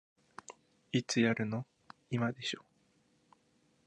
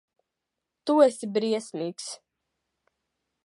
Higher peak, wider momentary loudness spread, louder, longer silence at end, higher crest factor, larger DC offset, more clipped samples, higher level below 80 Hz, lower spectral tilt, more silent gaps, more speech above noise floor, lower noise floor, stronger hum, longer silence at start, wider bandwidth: second, -16 dBFS vs -6 dBFS; first, 23 LU vs 17 LU; second, -35 LUFS vs -25 LUFS; about the same, 1.25 s vs 1.3 s; about the same, 22 dB vs 22 dB; neither; neither; first, -76 dBFS vs -88 dBFS; about the same, -5 dB/octave vs -4.5 dB/octave; neither; second, 39 dB vs 60 dB; second, -72 dBFS vs -85 dBFS; neither; second, 0.5 s vs 0.85 s; about the same, 10.5 kHz vs 11.5 kHz